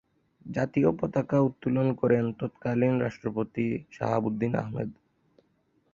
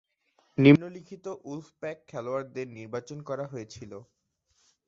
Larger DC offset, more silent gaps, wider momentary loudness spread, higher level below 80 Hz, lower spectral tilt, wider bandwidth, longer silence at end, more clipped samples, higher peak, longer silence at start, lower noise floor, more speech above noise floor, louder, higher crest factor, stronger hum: neither; neither; second, 8 LU vs 23 LU; first, -60 dBFS vs -66 dBFS; first, -9.5 dB/octave vs -6.5 dB/octave; about the same, 7.2 kHz vs 7.4 kHz; first, 1 s vs 0.85 s; neither; second, -10 dBFS vs -4 dBFS; second, 0.45 s vs 0.6 s; about the same, -70 dBFS vs -72 dBFS; about the same, 43 dB vs 44 dB; about the same, -28 LUFS vs -27 LUFS; second, 18 dB vs 26 dB; neither